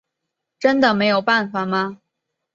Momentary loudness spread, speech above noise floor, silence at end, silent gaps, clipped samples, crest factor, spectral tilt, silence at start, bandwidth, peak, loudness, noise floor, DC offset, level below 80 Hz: 7 LU; 62 dB; 0.6 s; none; under 0.1%; 18 dB; -6 dB/octave; 0.6 s; 7.6 kHz; -2 dBFS; -18 LUFS; -80 dBFS; under 0.1%; -62 dBFS